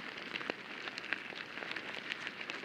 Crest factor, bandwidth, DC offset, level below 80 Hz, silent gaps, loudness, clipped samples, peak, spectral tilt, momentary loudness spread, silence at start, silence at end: 28 dB; 16.5 kHz; under 0.1%; -82 dBFS; none; -41 LUFS; under 0.1%; -14 dBFS; -2.5 dB/octave; 3 LU; 0 s; 0 s